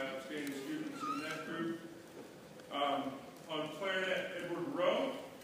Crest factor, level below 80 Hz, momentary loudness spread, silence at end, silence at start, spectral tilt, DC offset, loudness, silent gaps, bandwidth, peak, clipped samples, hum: 20 dB; -80 dBFS; 17 LU; 0 s; 0 s; -4 dB/octave; under 0.1%; -39 LUFS; none; 15.5 kHz; -20 dBFS; under 0.1%; none